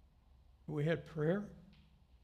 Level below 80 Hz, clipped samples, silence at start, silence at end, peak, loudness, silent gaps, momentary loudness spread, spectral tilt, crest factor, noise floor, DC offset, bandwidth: -66 dBFS; under 0.1%; 0.7 s; 0.6 s; -22 dBFS; -38 LUFS; none; 18 LU; -8.5 dB/octave; 20 dB; -65 dBFS; under 0.1%; 9 kHz